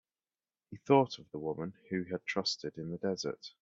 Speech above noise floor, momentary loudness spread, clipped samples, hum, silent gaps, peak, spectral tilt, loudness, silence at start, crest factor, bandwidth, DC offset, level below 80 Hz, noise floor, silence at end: over 56 dB; 13 LU; under 0.1%; none; none; -14 dBFS; -5 dB/octave; -34 LUFS; 0.7 s; 22 dB; 7.8 kHz; under 0.1%; -74 dBFS; under -90 dBFS; 0.1 s